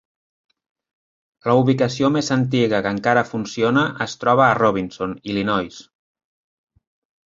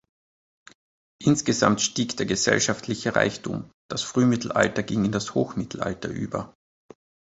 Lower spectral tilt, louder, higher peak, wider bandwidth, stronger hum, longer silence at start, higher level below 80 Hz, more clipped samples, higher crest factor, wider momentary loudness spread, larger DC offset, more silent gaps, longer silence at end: first, -6 dB/octave vs -4 dB/octave; first, -19 LUFS vs -24 LUFS; about the same, -2 dBFS vs -2 dBFS; about the same, 7.8 kHz vs 8.2 kHz; neither; first, 1.45 s vs 1.2 s; about the same, -56 dBFS vs -54 dBFS; neither; about the same, 20 dB vs 24 dB; about the same, 10 LU vs 11 LU; neither; second, none vs 3.74-3.89 s; first, 1.45 s vs 0.9 s